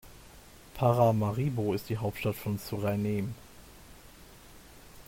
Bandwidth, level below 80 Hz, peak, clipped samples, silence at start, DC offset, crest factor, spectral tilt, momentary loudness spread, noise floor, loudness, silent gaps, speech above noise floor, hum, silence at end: 16.5 kHz; -56 dBFS; -12 dBFS; under 0.1%; 0.05 s; under 0.1%; 18 dB; -7.5 dB/octave; 15 LU; -52 dBFS; -30 LUFS; none; 23 dB; none; 0.05 s